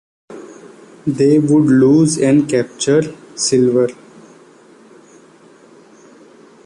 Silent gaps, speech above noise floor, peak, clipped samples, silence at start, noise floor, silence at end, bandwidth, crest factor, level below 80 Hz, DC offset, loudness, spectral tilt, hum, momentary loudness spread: none; 32 dB; -2 dBFS; under 0.1%; 0.3 s; -45 dBFS; 2.75 s; 11.5 kHz; 14 dB; -56 dBFS; under 0.1%; -14 LUFS; -5.5 dB/octave; none; 15 LU